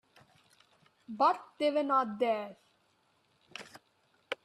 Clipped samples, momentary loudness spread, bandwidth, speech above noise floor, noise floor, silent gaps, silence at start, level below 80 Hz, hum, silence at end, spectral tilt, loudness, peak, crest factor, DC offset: under 0.1%; 19 LU; 13 kHz; 42 dB; -72 dBFS; none; 1.1 s; -84 dBFS; none; 0.1 s; -5 dB/octave; -31 LUFS; -14 dBFS; 20 dB; under 0.1%